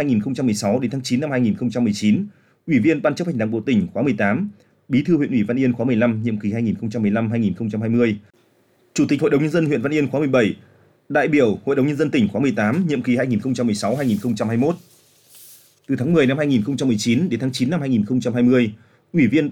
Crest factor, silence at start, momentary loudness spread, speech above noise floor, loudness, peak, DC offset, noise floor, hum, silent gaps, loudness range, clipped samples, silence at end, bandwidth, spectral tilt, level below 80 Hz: 14 dB; 0 s; 6 LU; 40 dB; -20 LUFS; -6 dBFS; under 0.1%; -59 dBFS; none; none; 2 LU; under 0.1%; 0 s; 15.5 kHz; -6.5 dB/octave; -58 dBFS